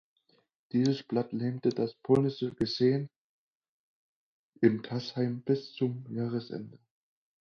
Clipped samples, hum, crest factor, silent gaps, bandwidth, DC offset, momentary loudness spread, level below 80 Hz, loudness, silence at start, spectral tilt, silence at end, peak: under 0.1%; none; 22 dB; 3.16-3.61 s, 3.68-4.53 s; 7.2 kHz; under 0.1%; 9 LU; -68 dBFS; -31 LUFS; 0.75 s; -7.5 dB/octave; 0.7 s; -10 dBFS